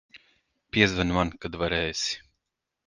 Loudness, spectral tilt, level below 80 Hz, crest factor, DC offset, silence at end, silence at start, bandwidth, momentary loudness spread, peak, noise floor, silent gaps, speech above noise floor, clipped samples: -26 LUFS; -4 dB/octave; -46 dBFS; 26 dB; under 0.1%; 0.7 s; 0.15 s; 10 kHz; 9 LU; -4 dBFS; -84 dBFS; none; 58 dB; under 0.1%